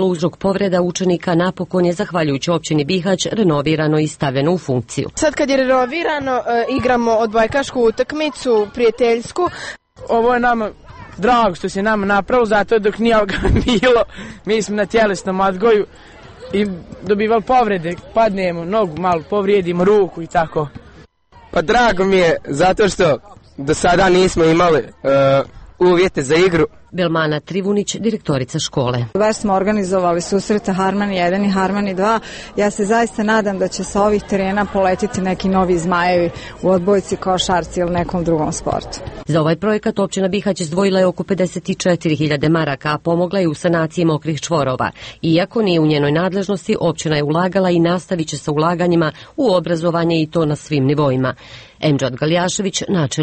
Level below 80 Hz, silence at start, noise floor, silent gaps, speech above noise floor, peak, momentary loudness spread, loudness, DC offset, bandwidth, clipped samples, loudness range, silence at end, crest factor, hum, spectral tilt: -38 dBFS; 0 s; -45 dBFS; none; 30 dB; -2 dBFS; 6 LU; -16 LUFS; under 0.1%; 8.8 kHz; under 0.1%; 3 LU; 0 s; 14 dB; none; -5.5 dB/octave